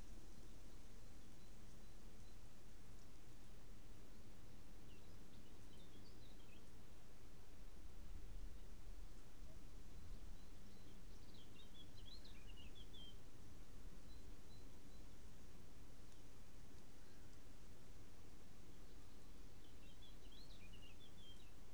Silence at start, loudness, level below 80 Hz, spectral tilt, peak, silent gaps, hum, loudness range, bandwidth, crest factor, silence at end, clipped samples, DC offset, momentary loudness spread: 0 s; -64 LUFS; -62 dBFS; -4.5 dB/octave; -40 dBFS; none; none; 3 LU; over 20 kHz; 16 dB; 0 s; under 0.1%; 0.4%; 4 LU